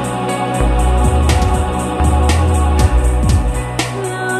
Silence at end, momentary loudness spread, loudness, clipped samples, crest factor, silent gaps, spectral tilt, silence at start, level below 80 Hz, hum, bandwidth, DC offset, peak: 0 s; 5 LU; -15 LUFS; under 0.1%; 12 dB; none; -5.5 dB/octave; 0 s; -16 dBFS; none; 13 kHz; under 0.1%; 0 dBFS